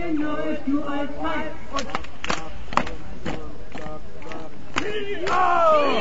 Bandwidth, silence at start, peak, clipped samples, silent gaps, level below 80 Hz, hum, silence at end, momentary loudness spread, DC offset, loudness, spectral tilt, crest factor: 8 kHz; 0 s; 0 dBFS; under 0.1%; none; -44 dBFS; none; 0 s; 19 LU; 7%; -25 LUFS; -5 dB/octave; 26 dB